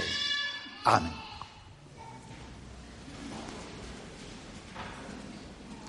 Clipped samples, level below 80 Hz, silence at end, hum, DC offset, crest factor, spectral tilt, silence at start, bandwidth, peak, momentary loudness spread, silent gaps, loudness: under 0.1%; -54 dBFS; 0 s; none; under 0.1%; 28 dB; -3.5 dB/octave; 0 s; 11.5 kHz; -8 dBFS; 20 LU; none; -34 LUFS